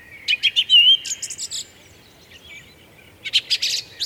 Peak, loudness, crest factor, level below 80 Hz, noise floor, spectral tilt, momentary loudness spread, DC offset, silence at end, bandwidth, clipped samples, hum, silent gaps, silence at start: -4 dBFS; -16 LUFS; 18 dB; -62 dBFS; -48 dBFS; 2.5 dB/octave; 19 LU; under 0.1%; 0 s; over 20 kHz; under 0.1%; none; none; 0.1 s